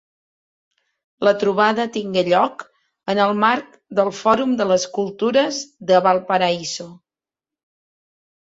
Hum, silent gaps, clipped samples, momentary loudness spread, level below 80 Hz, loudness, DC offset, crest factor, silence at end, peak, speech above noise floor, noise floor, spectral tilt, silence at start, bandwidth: none; none; under 0.1%; 9 LU; -66 dBFS; -19 LUFS; under 0.1%; 18 dB; 1.55 s; -2 dBFS; 71 dB; -89 dBFS; -4.5 dB/octave; 1.2 s; 7.8 kHz